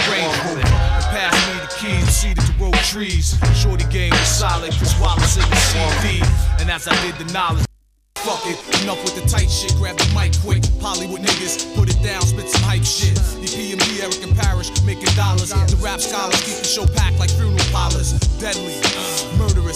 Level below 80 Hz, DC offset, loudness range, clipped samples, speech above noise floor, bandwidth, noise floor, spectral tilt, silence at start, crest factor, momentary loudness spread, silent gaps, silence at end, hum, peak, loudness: -22 dBFS; under 0.1%; 3 LU; under 0.1%; 23 dB; 16 kHz; -40 dBFS; -3.5 dB/octave; 0 s; 16 dB; 5 LU; none; 0 s; none; 0 dBFS; -18 LUFS